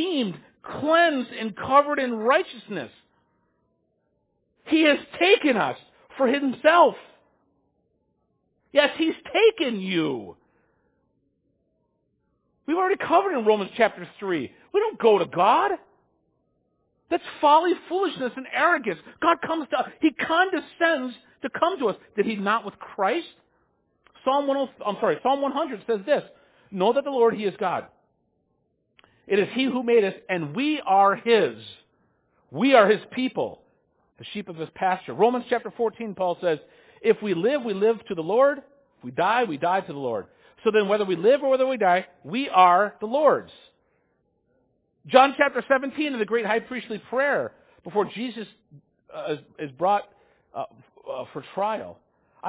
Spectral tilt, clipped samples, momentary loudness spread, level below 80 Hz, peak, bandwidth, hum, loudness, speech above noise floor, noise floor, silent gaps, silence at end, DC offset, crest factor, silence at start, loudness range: -8.5 dB/octave; under 0.1%; 15 LU; -68 dBFS; -2 dBFS; 4 kHz; none; -23 LUFS; 49 dB; -72 dBFS; none; 0 s; under 0.1%; 22 dB; 0 s; 6 LU